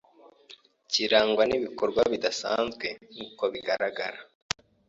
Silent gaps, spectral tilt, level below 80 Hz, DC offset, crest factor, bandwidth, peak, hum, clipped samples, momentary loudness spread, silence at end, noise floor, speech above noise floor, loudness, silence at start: none; -2.5 dB/octave; -62 dBFS; under 0.1%; 26 dB; 8 kHz; -4 dBFS; none; under 0.1%; 13 LU; 0.65 s; -55 dBFS; 28 dB; -27 LUFS; 0.5 s